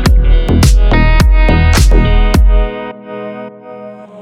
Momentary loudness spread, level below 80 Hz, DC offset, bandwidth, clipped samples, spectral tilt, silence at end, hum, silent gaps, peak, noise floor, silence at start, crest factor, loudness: 19 LU; -10 dBFS; under 0.1%; 14.5 kHz; under 0.1%; -5.5 dB/octave; 0 s; none; none; 0 dBFS; -29 dBFS; 0 s; 8 dB; -10 LUFS